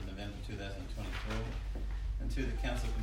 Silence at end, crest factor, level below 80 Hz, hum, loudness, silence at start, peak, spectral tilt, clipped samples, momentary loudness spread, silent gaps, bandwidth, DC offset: 0 s; 14 dB; -38 dBFS; none; -40 LUFS; 0 s; -24 dBFS; -5.5 dB/octave; under 0.1%; 6 LU; none; 12 kHz; under 0.1%